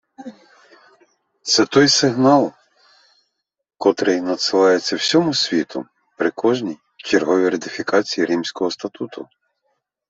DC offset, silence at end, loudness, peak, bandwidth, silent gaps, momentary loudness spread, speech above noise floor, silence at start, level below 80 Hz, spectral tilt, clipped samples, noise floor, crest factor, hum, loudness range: under 0.1%; 0.85 s; -18 LUFS; -2 dBFS; 8.2 kHz; none; 17 LU; 54 dB; 0.2 s; -64 dBFS; -3.5 dB/octave; under 0.1%; -72 dBFS; 18 dB; none; 3 LU